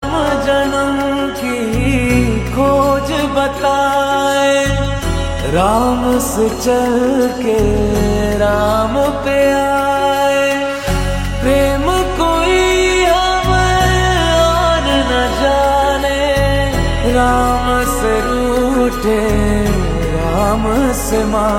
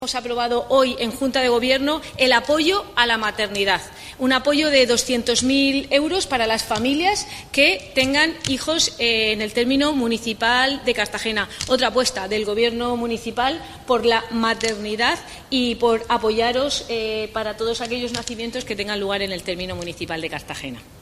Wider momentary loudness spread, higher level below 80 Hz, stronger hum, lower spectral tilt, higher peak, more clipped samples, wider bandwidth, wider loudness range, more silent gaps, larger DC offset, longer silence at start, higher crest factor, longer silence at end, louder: second, 4 LU vs 10 LU; first, -24 dBFS vs -46 dBFS; neither; first, -5 dB/octave vs -2.5 dB/octave; about the same, 0 dBFS vs 0 dBFS; neither; about the same, 16.5 kHz vs 15.5 kHz; second, 2 LU vs 5 LU; neither; neither; about the same, 0 s vs 0 s; second, 12 dB vs 20 dB; about the same, 0 s vs 0 s; first, -14 LUFS vs -20 LUFS